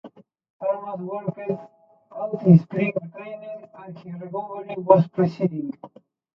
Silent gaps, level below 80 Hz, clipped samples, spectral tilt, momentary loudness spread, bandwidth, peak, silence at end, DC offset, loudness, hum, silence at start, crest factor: 0.50-0.59 s; -68 dBFS; under 0.1%; -11 dB/octave; 22 LU; 5.6 kHz; 0 dBFS; 0.5 s; under 0.1%; -23 LUFS; none; 0.05 s; 24 dB